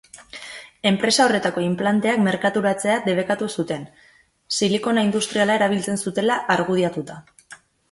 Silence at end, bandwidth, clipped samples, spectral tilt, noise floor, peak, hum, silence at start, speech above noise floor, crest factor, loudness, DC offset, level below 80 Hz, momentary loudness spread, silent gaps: 0.35 s; 11.5 kHz; under 0.1%; -4.5 dB/octave; -48 dBFS; -4 dBFS; none; 0.15 s; 27 dB; 18 dB; -20 LUFS; under 0.1%; -62 dBFS; 13 LU; none